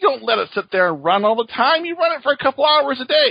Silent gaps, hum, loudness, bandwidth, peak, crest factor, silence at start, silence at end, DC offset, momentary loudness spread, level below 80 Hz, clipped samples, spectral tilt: none; none; -17 LUFS; 5.2 kHz; -2 dBFS; 16 dB; 0 s; 0 s; under 0.1%; 5 LU; -64 dBFS; under 0.1%; -6 dB/octave